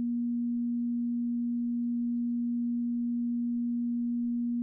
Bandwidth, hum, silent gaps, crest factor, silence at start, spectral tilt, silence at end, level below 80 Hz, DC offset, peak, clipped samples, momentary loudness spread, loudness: 0.3 kHz; none; none; 4 dB; 0 s; -12.5 dB/octave; 0 s; -74 dBFS; under 0.1%; -28 dBFS; under 0.1%; 0 LU; -31 LUFS